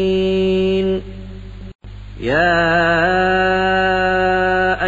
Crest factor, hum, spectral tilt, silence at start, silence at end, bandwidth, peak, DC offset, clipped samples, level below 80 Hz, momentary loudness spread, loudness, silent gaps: 12 dB; 50 Hz at -35 dBFS; -6.5 dB/octave; 0 s; 0 s; 7.8 kHz; -4 dBFS; under 0.1%; under 0.1%; -34 dBFS; 20 LU; -16 LUFS; 1.75-1.79 s